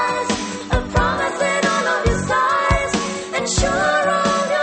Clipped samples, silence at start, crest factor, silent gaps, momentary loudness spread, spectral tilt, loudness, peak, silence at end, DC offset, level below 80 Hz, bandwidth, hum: under 0.1%; 0 s; 16 dB; none; 6 LU; -4 dB/octave; -18 LUFS; -4 dBFS; 0 s; under 0.1%; -30 dBFS; 8.8 kHz; none